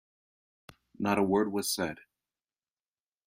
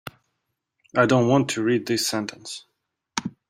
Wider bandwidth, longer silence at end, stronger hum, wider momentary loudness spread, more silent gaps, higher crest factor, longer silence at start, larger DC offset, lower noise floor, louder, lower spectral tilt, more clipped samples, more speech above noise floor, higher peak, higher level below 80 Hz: about the same, 15.5 kHz vs 16 kHz; first, 1.3 s vs 0.2 s; neither; second, 10 LU vs 18 LU; neither; about the same, 20 dB vs 22 dB; first, 1 s vs 0.05 s; neither; first, under -90 dBFS vs -78 dBFS; second, -30 LUFS vs -22 LUFS; about the same, -4.5 dB/octave vs -4.5 dB/octave; neither; first, over 61 dB vs 57 dB; second, -14 dBFS vs -2 dBFS; second, -70 dBFS vs -62 dBFS